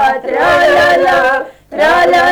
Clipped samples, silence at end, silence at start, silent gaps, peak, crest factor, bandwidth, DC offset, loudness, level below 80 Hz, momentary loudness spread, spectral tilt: under 0.1%; 0 s; 0 s; none; -4 dBFS; 6 dB; over 20 kHz; under 0.1%; -10 LUFS; -42 dBFS; 6 LU; -3.5 dB/octave